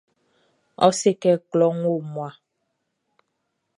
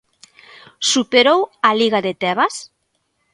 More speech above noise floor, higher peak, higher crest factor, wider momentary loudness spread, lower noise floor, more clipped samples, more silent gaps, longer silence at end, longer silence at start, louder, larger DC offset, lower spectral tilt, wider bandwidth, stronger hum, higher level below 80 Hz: about the same, 55 dB vs 52 dB; about the same, -2 dBFS vs 0 dBFS; about the same, 22 dB vs 18 dB; first, 14 LU vs 7 LU; first, -76 dBFS vs -69 dBFS; neither; neither; first, 1.45 s vs 0.7 s; about the same, 0.8 s vs 0.8 s; second, -21 LUFS vs -16 LUFS; neither; first, -5.5 dB/octave vs -2.5 dB/octave; about the same, 11.5 kHz vs 11.5 kHz; neither; second, -72 dBFS vs -66 dBFS